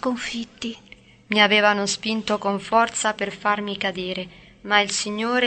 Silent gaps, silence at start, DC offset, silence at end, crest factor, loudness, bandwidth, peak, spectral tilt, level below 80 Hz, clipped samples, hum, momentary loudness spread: none; 0.05 s; under 0.1%; 0 s; 22 dB; -22 LUFS; 9.2 kHz; -2 dBFS; -2.5 dB/octave; -58 dBFS; under 0.1%; none; 15 LU